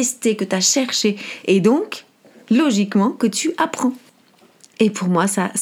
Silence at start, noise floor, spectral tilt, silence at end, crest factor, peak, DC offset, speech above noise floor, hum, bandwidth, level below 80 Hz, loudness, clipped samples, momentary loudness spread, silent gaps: 0 s; -53 dBFS; -4 dB/octave; 0 s; 16 dB; -2 dBFS; under 0.1%; 35 dB; none; 16.5 kHz; -72 dBFS; -18 LUFS; under 0.1%; 7 LU; none